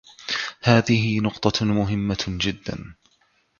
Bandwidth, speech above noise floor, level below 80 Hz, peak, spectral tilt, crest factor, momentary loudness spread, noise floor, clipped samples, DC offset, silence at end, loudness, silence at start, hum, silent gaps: 7.2 kHz; 43 dB; -46 dBFS; -2 dBFS; -5.5 dB/octave; 22 dB; 11 LU; -64 dBFS; under 0.1%; under 0.1%; 0.7 s; -22 LUFS; 0.2 s; none; none